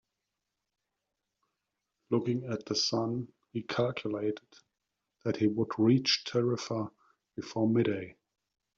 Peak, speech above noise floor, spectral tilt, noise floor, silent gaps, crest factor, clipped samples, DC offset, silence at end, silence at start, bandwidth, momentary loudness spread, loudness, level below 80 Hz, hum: -14 dBFS; 56 dB; -5 dB/octave; -86 dBFS; none; 20 dB; under 0.1%; under 0.1%; 0.65 s; 2.1 s; 7.6 kHz; 14 LU; -31 LUFS; -72 dBFS; none